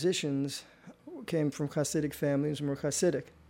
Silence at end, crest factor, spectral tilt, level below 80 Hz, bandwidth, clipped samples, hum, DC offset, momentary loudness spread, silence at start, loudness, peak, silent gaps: 0.2 s; 16 dB; -5 dB/octave; -64 dBFS; 16 kHz; under 0.1%; none; under 0.1%; 9 LU; 0 s; -32 LUFS; -16 dBFS; none